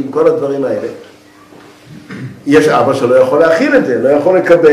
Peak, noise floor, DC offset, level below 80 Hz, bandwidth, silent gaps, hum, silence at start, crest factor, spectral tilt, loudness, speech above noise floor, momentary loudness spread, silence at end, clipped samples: 0 dBFS; -39 dBFS; under 0.1%; -52 dBFS; 13 kHz; none; none; 0 s; 12 dB; -6 dB/octave; -10 LUFS; 30 dB; 16 LU; 0 s; under 0.1%